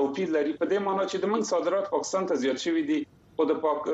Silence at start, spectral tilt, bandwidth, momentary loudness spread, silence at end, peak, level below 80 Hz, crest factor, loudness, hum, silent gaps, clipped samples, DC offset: 0 s; -4.5 dB/octave; 8.6 kHz; 3 LU; 0 s; -12 dBFS; -70 dBFS; 14 dB; -27 LUFS; none; none; under 0.1%; under 0.1%